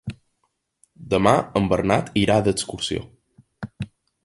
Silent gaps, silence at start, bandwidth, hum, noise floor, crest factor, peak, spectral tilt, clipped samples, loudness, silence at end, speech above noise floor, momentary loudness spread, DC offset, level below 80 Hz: none; 0.05 s; 11.5 kHz; none; -72 dBFS; 22 dB; -2 dBFS; -5.5 dB/octave; under 0.1%; -21 LUFS; 0.4 s; 52 dB; 18 LU; under 0.1%; -46 dBFS